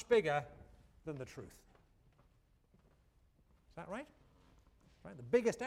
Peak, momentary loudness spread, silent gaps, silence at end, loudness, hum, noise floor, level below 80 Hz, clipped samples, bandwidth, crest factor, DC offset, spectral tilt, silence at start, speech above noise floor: -20 dBFS; 24 LU; none; 0 s; -38 LUFS; none; -71 dBFS; -68 dBFS; under 0.1%; 12.5 kHz; 22 dB; under 0.1%; -5.5 dB/octave; 0 s; 34 dB